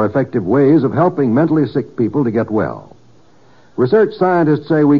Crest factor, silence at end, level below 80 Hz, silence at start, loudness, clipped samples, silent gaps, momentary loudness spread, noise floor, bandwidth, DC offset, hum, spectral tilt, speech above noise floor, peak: 12 dB; 0 s; -54 dBFS; 0 s; -15 LUFS; under 0.1%; none; 7 LU; -49 dBFS; 5.4 kHz; 0.5%; none; -8 dB/octave; 35 dB; -2 dBFS